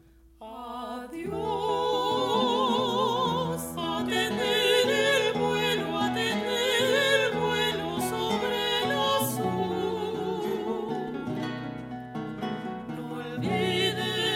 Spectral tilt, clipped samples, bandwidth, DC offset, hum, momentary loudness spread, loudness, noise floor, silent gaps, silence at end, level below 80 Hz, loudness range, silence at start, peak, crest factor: -4 dB/octave; under 0.1%; 16 kHz; under 0.1%; none; 13 LU; -27 LUFS; -48 dBFS; none; 0 s; -58 dBFS; 8 LU; 0.4 s; -10 dBFS; 18 dB